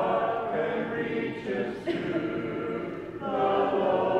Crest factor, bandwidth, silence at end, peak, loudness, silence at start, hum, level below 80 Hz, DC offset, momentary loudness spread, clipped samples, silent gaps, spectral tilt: 16 dB; 9.4 kHz; 0 s; -12 dBFS; -29 LUFS; 0 s; none; -60 dBFS; under 0.1%; 7 LU; under 0.1%; none; -7.5 dB/octave